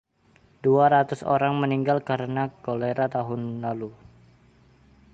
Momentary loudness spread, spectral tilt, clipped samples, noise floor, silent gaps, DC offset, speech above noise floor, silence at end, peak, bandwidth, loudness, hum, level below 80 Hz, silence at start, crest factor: 11 LU; -8 dB/octave; under 0.1%; -60 dBFS; none; under 0.1%; 36 dB; 1.2 s; -8 dBFS; 8.6 kHz; -24 LUFS; none; -62 dBFS; 0.65 s; 18 dB